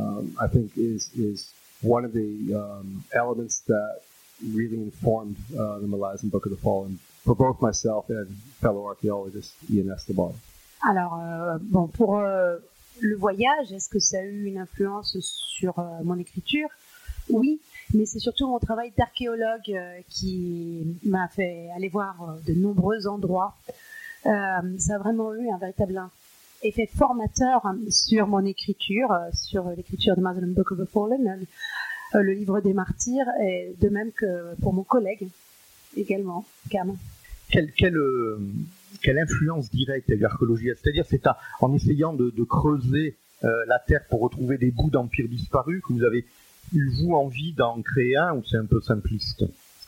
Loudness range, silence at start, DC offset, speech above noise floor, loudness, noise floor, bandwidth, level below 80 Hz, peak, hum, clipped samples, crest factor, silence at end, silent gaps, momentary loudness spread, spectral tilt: 5 LU; 0 s; under 0.1%; 29 dB; -25 LUFS; -54 dBFS; 17 kHz; -44 dBFS; -4 dBFS; none; under 0.1%; 22 dB; 0.35 s; none; 10 LU; -5.5 dB/octave